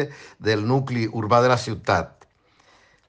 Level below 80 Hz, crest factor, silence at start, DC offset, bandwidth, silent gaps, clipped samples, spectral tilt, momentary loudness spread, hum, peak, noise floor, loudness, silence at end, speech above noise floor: -54 dBFS; 18 dB; 0 s; under 0.1%; 9.4 kHz; none; under 0.1%; -6 dB/octave; 11 LU; none; -4 dBFS; -59 dBFS; -22 LUFS; 1 s; 37 dB